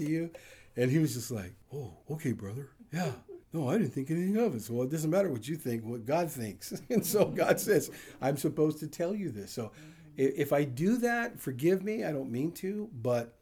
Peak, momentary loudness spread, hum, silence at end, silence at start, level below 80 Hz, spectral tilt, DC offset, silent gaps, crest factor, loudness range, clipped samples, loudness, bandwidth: -12 dBFS; 13 LU; none; 0.1 s; 0 s; -68 dBFS; -6 dB/octave; under 0.1%; none; 20 dB; 4 LU; under 0.1%; -32 LUFS; over 20 kHz